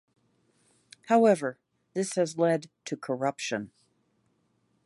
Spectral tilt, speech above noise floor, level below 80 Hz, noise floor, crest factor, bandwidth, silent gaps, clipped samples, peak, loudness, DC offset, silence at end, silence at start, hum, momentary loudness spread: -5 dB/octave; 45 dB; -78 dBFS; -72 dBFS; 20 dB; 11.5 kHz; none; under 0.1%; -10 dBFS; -28 LUFS; under 0.1%; 1.2 s; 1.1 s; none; 15 LU